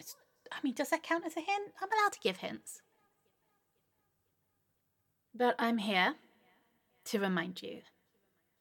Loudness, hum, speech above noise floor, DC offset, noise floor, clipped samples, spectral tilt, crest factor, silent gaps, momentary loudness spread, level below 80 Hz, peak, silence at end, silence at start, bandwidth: -34 LUFS; none; 46 dB; under 0.1%; -80 dBFS; under 0.1%; -4 dB/octave; 22 dB; none; 19 LU; under -90 dBFS; -14 dBFS; 0.8 s; 0 s; 17.5 kHz